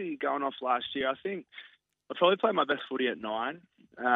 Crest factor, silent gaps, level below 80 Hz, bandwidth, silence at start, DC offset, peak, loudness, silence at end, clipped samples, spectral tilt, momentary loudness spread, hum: 20 dB; none; -76 dBFS; 4.3 kHz; 0 s; under 0.1%; -10 dBFS; -30 LUFS; 0 s; under 0.1%; -7 dB/octave; 16 LU; none